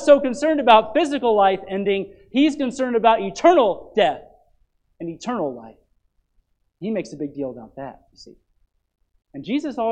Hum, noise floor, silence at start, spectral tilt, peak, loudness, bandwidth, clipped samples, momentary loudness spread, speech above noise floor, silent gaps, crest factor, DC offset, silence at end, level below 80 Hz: none; -66 dBFS; 0 s; -5 dB/octave; 0 dBFS; -20 LUFS; 9.8 kHz; under 0.1%; 20 LU; 46 dB; none; 20 dB; under 0.1%; 0 s; -58 dBFS